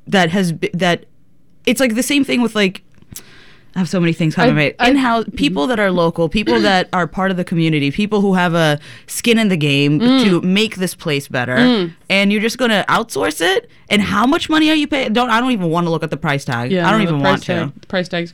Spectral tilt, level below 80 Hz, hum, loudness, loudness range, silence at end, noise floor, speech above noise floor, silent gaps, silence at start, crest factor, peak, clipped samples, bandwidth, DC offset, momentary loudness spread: -5 dB/octave; -44 dBFS; none; -15 LUFS; 2 LU; 0.05 s; -55 dBFS; 40 dB; none; 0.05 s; 14 dB; -2 dBFS; under 0.1%; 19.5 kHz; 0.7%; 7 LU